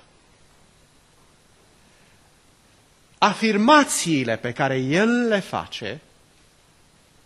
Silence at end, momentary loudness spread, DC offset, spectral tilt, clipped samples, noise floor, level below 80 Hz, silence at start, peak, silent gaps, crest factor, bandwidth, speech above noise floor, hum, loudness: 1.25 s; 16 LU; under 0.1%; -4 dB/octave; under 0.1%; -56 dBFS; -62 dBFS; 3.2 s; -2 dBFS; none; 22 dB; 12.5 kHz; 36 dB; none; -20 LUFS